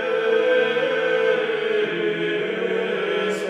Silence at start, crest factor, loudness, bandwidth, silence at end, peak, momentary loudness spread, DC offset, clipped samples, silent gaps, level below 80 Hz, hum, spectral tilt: 0 s; 14 dB; -21 LUFS; 10.5 kHz; 0 s; -8 dBFS; 5 LU; under 0.1%; under 0.1%; none; -86 dBFS; none; -4.5 dB/octave